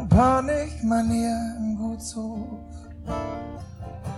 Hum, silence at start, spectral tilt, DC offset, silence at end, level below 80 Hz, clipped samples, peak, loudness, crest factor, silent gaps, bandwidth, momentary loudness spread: none; 0 s; -7 dB/octave; under 0.1%; 0 s; -38 dBFS; under 0.1%; -6 dBFS; -25 LUFS; 18 dB; none; 12.5 kHz; 18 LU